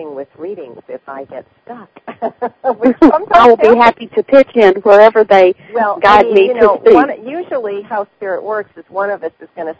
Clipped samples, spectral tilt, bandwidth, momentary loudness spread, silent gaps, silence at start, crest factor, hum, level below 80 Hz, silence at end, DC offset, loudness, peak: 2%; -6 dB/octave; 8 kHz; 21 LU; none; 0 s; 12 dB; none; -46 dBFS; 0.05 s; under 0.1%; -10 LUFS; 0 dBFS